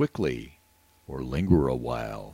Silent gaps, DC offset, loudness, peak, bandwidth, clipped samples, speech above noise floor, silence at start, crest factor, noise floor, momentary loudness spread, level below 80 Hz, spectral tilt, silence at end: none; under 0.1%; -28 LUFS; -8 dBFS; 16 kHz; under 0.1%; 35 dB; 0 s; 20 dB; -62 dBFS; 16 LU; -42 dBFS; -8 dB/octave; 0 s